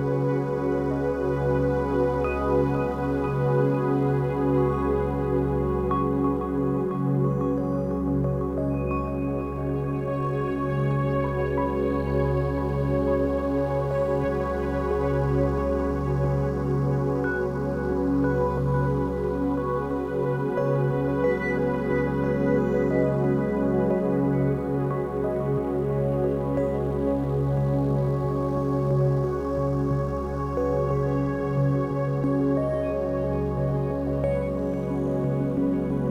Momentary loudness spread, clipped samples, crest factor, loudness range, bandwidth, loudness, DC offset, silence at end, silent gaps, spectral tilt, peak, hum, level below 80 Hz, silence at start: 4 LU; under 0.1%; 14 dB; 2 LU; 6.4 kHz; -25 LUFS; under 0.1%; 0 s; none; -10 dB/octave; -10 dBFS; none; -38 dBFS; 0 s